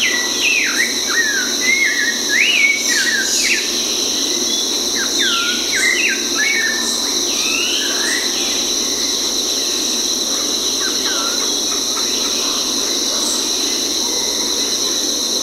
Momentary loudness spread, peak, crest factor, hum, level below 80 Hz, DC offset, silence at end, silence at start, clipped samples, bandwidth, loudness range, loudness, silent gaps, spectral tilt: 3 LU; 0 dBFS; 16 dB; none; -50 dBFS; under 0.1%; 0 s; 0 s; under 0.1%; 16 kHz; 2 LU; -14 LUFS; none; 1 dB/octave